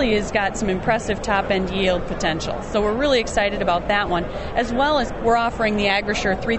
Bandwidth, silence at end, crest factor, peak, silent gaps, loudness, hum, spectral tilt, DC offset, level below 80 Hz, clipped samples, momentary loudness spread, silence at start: 8.4 kHz; 0 s; 16 dB; -6 dBFS; none; -21 LUFS; none; -4.5 dB/octave; under 0.1%; -34 dBFS; under 0.1%; 5 LU; 0 s